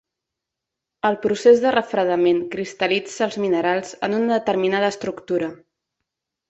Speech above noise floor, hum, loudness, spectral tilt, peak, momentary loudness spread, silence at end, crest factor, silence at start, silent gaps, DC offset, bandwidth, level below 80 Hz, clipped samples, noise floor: 64 dB; none; -20 LUFS; -5 dB/octave; -2 dBFS; 9 LU; 0.95 s; 18 dB; 1.05 s; none; under 0.1%; 8.2 kHz; -64 dBFS; under 0.1%; -84 dBFS